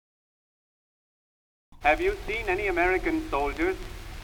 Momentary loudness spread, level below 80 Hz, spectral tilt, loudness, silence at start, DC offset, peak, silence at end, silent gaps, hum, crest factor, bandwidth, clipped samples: 6 LU; -40 dBFS; -5.5 dB/octave; -27 LUFS; 1.7 s; under 0.1%; -8 dBFS; 0 s; none; none; 20 dB; 20 kHz; under 0.1%